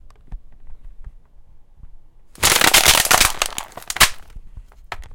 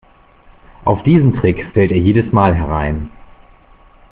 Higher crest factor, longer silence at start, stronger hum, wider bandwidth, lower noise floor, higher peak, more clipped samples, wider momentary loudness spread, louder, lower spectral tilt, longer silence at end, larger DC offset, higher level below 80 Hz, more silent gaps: first, 20 dB vs 14 dB; second, 0.25 s vs 0.8 s; neither; first, 18 kHz vs 4.5 kHz; second, -42 dBFS vs -46 dBFS; about the same, 0 dBFS vs 0 dBFS; neither; first, 20 LU vs 10 LU; about the same, -14 LUFS vs -14 LUFS; second, 0 dB/octave vs -8 dB/octave; second, 0 s vs 1.05 s; neither; about the same, -36 dBFS vs -32 dBFS; neither